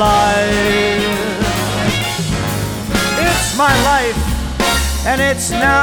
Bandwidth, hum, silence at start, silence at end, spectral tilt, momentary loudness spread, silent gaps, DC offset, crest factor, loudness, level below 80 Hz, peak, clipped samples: over 20 kHz; none; 0 s; 0 s; -4 dB/octave; 6 LU; none; under 0.1%; 14 dB; -15 LUFS; -26 dBFS; 0 dBFS; under 0.1%